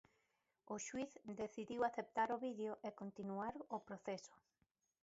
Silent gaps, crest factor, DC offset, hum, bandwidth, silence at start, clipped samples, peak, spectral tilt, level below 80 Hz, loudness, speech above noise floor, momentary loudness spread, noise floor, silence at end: none; 20 dB; under 0.1%; none; 7.6 kHz; 0.65 s; under 0.1%; -26 dBFS; -4.5 dB/octave; -82 dBFS; -46 LUFS; 39 dB; 9 LU; -85 dBFS; 0.7 s